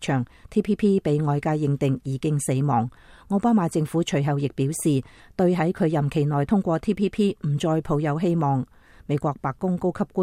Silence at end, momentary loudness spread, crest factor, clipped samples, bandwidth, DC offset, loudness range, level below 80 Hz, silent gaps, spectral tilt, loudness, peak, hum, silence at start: 0 s; 6 LU; 14 dB; under 0.1%; 15.5 kHz; under 0.1%; 1 LU; -50 dBFS; none; -7 dB/octave; -24 LUFS; -10 dBFS; none; 0 s